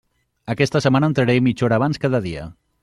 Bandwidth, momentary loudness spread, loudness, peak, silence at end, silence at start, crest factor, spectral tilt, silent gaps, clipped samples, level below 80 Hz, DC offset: 11.5 kHz; 15 LU; -19 LUFS; -2 dBFS; 0.3 s; 0.45 s; 18 dB; -7 dB/octave; none; under 0.1%; -50 dBFS; under 0.1%